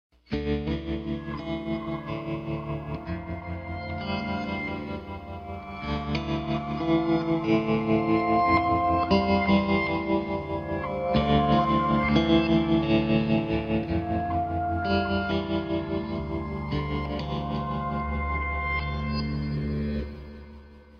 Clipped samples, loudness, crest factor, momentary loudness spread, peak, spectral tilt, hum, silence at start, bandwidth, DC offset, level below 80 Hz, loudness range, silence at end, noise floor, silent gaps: under 0.1%; -27 LUFS; 18 dB; 12 LU; -8 dBFS; -8.5 dB/octave; none; 0.3 s; 6.6 kHz; under 0.1%; -40 dBFS; 9 LU; 0 s; -47 dBFS; none